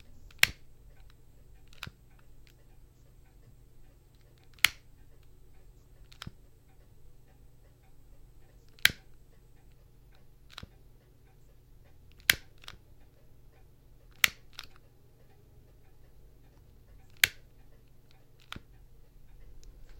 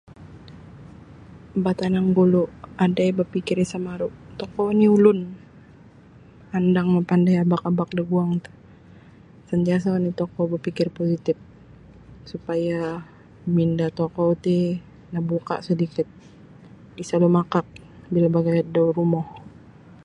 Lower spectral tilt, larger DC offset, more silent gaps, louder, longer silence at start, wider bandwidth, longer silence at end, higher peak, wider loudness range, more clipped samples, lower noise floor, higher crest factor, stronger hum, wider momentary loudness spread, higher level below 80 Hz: second, 0 dB/octave vs -8.5 dB/octave; neither; neither; second, -28 LUFS vs -22 LUFS; about the same, 0.1 s vs 0.2 s; first, 16.5 kHz vs 9.6 kHz; second, 0 s vs 0.55 s; about the same, 0 dBFS vs -2 dBFS; first, 21 LU vs 5 LU; neither; first, -58 dBFS vs -48 dBFS; first, 40 dB vs 20 dB; neither; first, 26 LU vs 13 LU; about the same, -58 dBFS vs -54 dBFS